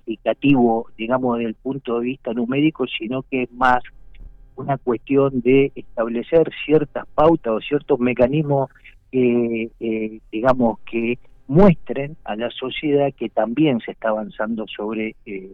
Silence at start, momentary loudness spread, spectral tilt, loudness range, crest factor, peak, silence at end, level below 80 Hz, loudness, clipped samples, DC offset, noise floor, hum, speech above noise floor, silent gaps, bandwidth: 0.05 s; 10 LU; -9 dB/octave; 4 LU; 16 dB; -4 dBFS; 0 s; -42 dBFS; -20 LUFS; under 0.1%; under 0.1%; -41 dBFS; none; 21 dB; none; 6 kHz